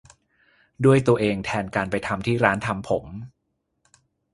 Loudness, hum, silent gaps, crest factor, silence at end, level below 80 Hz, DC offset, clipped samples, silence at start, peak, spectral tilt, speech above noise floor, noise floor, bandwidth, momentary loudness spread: -22 LUFS; none; none; 24 dB; 1.05 s; -50 dBFS; under 0.1%; under 0.1%; 0.8 s; 0 dBFS; -7 dB/octave; 53 dB; -75 dBFS; 11.5 kHz; 9 LU